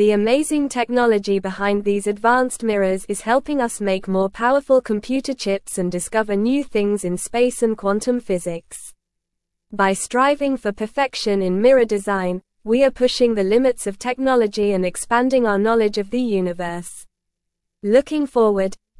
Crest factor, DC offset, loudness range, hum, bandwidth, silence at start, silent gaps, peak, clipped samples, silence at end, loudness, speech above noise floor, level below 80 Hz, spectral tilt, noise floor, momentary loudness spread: 18 dB; under 0.1%; 4 LU; none; 12 kHz; 0 s; none; -2 dBFS; under 0.1%; 0.25 s; -19 LUFS; 60 dB; -48 dBFS; -5 dB/octave; -78 dBFS; 7 LU